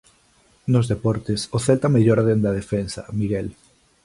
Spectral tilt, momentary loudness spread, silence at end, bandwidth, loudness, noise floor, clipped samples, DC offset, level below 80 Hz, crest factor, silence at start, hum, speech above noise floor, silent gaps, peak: -7 dB/octave; 11 LU; 0.55 s; 11.5 kHz; -21 LUFS; -58 dBFS; under 0.1%; under 0.1%; -46 dBFS; 16 dB; 0.65 s; none; 38 dB; none; -4 dBFS